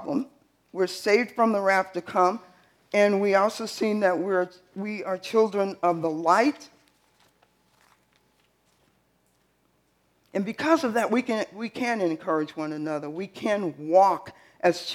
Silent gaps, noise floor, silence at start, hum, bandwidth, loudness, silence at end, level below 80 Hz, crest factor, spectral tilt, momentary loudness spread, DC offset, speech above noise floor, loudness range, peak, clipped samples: none; -68 dBFS; 0 s; none; 16 kHz; -25 LUFS; 0 s; -76 dBFS; 20 dB; -5 dB/octave; 11 LU; under 0.1%; 43 dB; 6 LU; -6 dBFS; under 0.1%